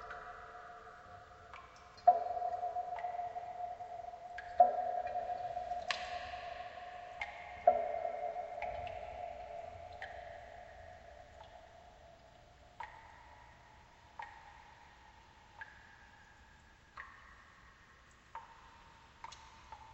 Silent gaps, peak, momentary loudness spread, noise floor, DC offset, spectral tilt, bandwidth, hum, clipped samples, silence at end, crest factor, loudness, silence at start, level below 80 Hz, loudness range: none; -14 dBFS; 27 LU; -63 dBFS; under 0.1%; -3.5 dB/octave; 8.2 kHz; none; under 0.1%; 0 s; 28 dB; -39 LUFS; 0 s; -66 dBFS; 19 LU